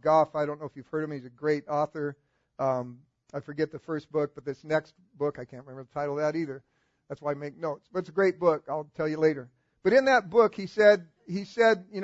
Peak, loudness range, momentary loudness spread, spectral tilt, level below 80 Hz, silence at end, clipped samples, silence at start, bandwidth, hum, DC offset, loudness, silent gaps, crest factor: -8 dBFS; 9 LU; 16 LU; -6.5 dB/octave; -70 dBFS; 0 s; under 0.1%; 0.05 s; 8 kHz; none; under 0.1%; -28 LUFS; none; 20 dB